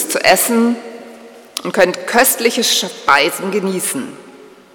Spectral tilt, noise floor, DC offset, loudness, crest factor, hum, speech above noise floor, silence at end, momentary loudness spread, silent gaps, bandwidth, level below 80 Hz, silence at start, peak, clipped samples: -2 dB/octave; -40 dBFS; under 0.1%; -14 LUFS; 16 dB; none; 25 dB; 0.25 s; 14 LU; none; over 20 kHz; -56 dBFS; 0 s; 0 dBFS; 0.3%